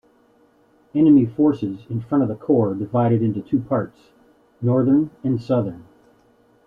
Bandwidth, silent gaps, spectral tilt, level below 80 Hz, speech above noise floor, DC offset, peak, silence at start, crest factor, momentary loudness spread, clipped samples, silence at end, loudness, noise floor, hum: 4.9 kHz; none; -11 dB/octave; -58 dBFS; 38 dB; under 0.1%; -6 dBFS; 0.95 s; 16 dB; 12 LU; under 0.1%; 0.85 s; -20 LUFS; -57 dBFS; none